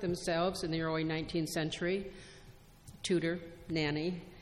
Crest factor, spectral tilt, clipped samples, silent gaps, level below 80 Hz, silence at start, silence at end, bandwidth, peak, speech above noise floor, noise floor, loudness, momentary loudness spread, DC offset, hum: 14 dB; -5 dB/octave; under 0.1%; none; -58 dBFS; 0 s; 0 s; 14 kHz; -20 dBFS; 21 dB; -56 dBFS; -35 LUFS; 9 LU; under 0.1%; none